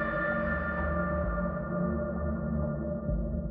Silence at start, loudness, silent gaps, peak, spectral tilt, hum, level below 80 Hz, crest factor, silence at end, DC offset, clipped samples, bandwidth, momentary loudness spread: 0 s; -32 LUFS; none; -18 dBFS; -8 dB/octave; none; -38 dBFS; 12 dB; 0 s; under 0.1%; under 0.1%; 4 kHz; 3 LU